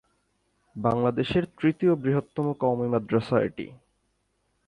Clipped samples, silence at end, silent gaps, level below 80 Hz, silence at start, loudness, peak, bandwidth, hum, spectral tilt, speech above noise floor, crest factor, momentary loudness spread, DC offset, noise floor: under 0.1%; 0.95 s; none; -56 dBFS; 0.75 s; -26 LUFS; -10 dBFS; 11 kHz; 50 Hz at -60 dBFS; -8.5 dB/octave; 48 dB; 18 dB; 8 LU; under 0.1%; -73 dBFS